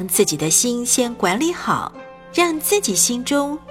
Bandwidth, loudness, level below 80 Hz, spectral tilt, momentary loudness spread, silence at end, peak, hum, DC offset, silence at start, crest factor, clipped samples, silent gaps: 17 kHz; -18 LUFS; -52 dBFS; -2.5 dB/octave; 7 LU; 0 s; -2 dBFS; none; under 0.1%; 0 s; 18 dB; under 0.1%; none